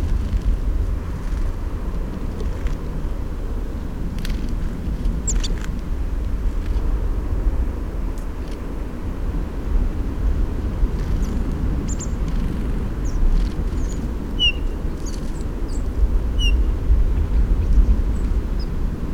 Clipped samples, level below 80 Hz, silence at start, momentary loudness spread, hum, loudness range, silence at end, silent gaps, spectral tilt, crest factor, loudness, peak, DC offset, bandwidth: under 0.1%; -22 dBFS; 0 s; 8 LU; none; 5 LU; 0 s; none; -5.5 dB/octave; 16 dB; -25 LUFS; -4 dBFS; 1%; 9.2 kHz